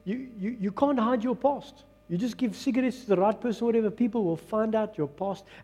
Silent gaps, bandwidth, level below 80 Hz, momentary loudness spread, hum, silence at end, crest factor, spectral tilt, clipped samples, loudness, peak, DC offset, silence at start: none; 13 kHz; -64 dBFS; 9 LU; none; 0 s; 18 dB; -7 dB/octave; under 0.1%; -28 LUFS; -10 dBFS; under 0.1%; 0.05 s